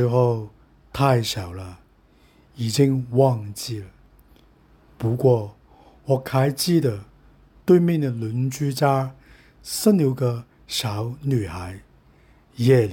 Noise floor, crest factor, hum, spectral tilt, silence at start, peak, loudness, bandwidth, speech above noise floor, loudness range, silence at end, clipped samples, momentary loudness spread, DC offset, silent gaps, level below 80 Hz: -56 dBFS; 18 dB; none; -6.5 dB/octave; 0 s; -4 dBFS; -22 LUFS; 17 kHz; 35 dB; 3 LU; 0 s; under 0.1%; 17 LU; under 0.1%; none; -52 dBFS